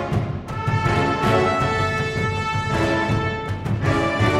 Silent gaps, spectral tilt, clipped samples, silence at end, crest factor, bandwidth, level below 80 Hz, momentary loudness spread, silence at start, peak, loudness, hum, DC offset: none; -6.5 dB/octave; under 0.1%; 0 s; 16 dB; 13 kHz; -38 dBFS; 6 LU; 0 s; -4 dBFS; -21 LUFS; none; under 0.1%